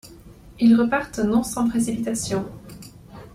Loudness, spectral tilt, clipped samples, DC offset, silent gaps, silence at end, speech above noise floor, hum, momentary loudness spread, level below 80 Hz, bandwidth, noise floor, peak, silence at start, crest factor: -21 LUFS; -5 dB/octave; under 0.1%; under 0.1%; none; 0.05 s; 24 dB; none; 24 LU; -48 dBFS; 15 kHz; -45 dBFS; -8 dBFS; 0.05 s; 16 dB